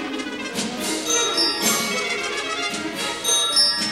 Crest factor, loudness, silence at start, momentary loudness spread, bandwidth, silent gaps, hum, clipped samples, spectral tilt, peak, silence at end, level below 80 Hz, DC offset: 16 dB; -20 LUFS; 0 s; 10 LU; 20 kHz; none; none; under 0.1%; -0.5 dB/octave; -8 dBFS; 0 s; -60 dBFS; under 0.1%